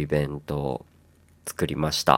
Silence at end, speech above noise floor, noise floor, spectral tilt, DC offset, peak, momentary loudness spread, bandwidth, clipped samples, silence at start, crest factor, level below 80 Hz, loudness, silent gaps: 0 s; 32 dB; -57 dBFS; -5 dB/octave; under 0.1%; 0 dBFS; 12 LU; 17 kHz; under 0.1%; 0 s; 26 dB; -46 dBFS; -29 LUFS; none